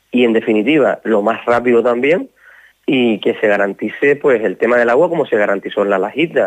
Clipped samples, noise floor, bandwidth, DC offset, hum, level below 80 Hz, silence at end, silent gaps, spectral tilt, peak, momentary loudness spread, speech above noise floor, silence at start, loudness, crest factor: under 0.1%; -46 dBFS; 9 kHz; under 0.1%; none; -60 dBFS; 0 s; none; -6.5 dB/octave; -2 dBFS; 4 LU; 32 dB; 0.15 s; -14 LUFS; 12 dB